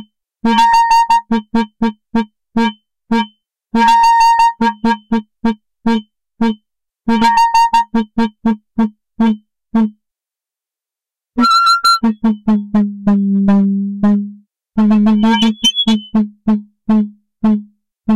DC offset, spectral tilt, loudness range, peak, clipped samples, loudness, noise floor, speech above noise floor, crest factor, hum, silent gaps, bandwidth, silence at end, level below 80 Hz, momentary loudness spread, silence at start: 0.9%; -5 dB/octave; 3 LU; -2 dBFS; under 0.1%; -14 LUFS; -88 dBFS; 75 dB; 12 dB; none; none; 13 kHz; 0 s; -44 dBFS; 10 LU; 0 s